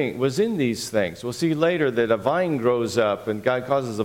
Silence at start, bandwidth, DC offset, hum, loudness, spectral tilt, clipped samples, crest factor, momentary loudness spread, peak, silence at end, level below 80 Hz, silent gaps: 0 s; 17 kHz; under 0.1%; none; -23 LUFS; -5.5 dB/octave; under 0.1%; 18 dB; 4 LU; -6 dBFS; 0 s; -60 dBFS; none